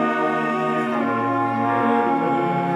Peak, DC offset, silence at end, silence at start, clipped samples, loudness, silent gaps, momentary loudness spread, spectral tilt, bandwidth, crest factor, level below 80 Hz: -6 dBFS; under 0.1%; 0 s; 0 s; under 0.1%; -21 LUFS; none; 3 LU; -7.5 dB/octave; 11.5 kHz; 14 dB; -72 dBFS